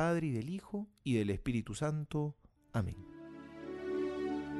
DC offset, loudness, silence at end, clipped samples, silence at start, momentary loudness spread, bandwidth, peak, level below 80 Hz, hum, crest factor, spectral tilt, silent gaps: under 0.1%; -38 LUFS; 0 s; under 0.1%; 0 s; 14 LU; 12 kHz; -22 dBFS; -58 dBFS; none; 16 dB; -7 dB/octave; none